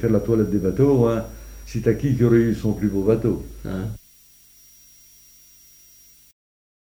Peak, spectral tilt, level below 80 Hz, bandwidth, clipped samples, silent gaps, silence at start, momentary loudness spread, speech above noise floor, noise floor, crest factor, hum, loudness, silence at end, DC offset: -4 dBFS; -8.5 dB/octave; -40 dBFS; over 20 kHz; under 0.1%; none; 0 s; 15 LU; 32 dB; -52 dBFS; 18 dB; 50 Hz at -40 dBFS; -21 LUFS; 2.9 s; under 0.1%